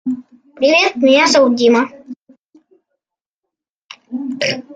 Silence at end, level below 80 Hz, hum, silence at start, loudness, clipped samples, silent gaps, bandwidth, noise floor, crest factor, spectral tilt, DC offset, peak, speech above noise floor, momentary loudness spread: 0 s; -66 dBFS; none; 0.05 s; -13 LUFS; under 0.1%; 2.22-2.26 s, 2.38-2.49 s, 3.26-3.43 s, 3.70-3.89 s; 9.4 kHz; -82 dBFS; 16 dB; -3 dB/octave; under 0.1%; 0 dBFS; 70 dB; 16 LU